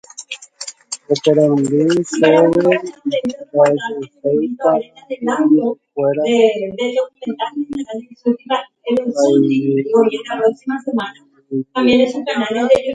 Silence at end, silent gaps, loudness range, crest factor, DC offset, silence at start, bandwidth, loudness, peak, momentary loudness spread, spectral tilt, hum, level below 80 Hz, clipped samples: 0 s; none; 4 LU; 16 dB; under 0.1%; 0.2 s; 9.4 kHz; -16 LUFS; 0 dBFS; 13 LU; -5.5 dB/octave; none; -58 dBFS; under 0.1%